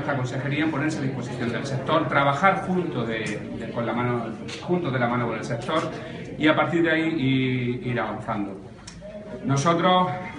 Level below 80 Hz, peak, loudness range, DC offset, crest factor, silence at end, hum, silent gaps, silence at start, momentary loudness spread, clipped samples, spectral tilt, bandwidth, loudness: -54 dBFS; -2 dBFS; 3 LU; under 0.1%; 22 dB; 0 s; none; none; 0 s; 13 LU; under 0.1%; -6 dB/octave; 10.5 kHz; -24 LUFS